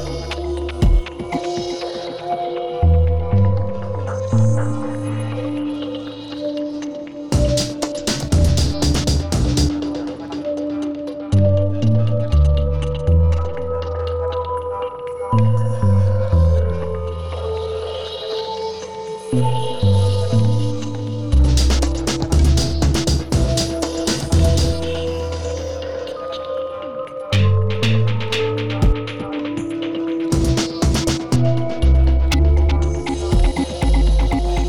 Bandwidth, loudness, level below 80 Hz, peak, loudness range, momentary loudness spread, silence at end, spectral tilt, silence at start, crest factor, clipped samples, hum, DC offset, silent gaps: 13.5 kHz; -20 LUFS; -22 dBFS; -6 dBFS; 4 LU; 10 LU; 0 s; -6 dB/octave; 0 s; 12 dB; under 0.1%; none; under 0.1%; none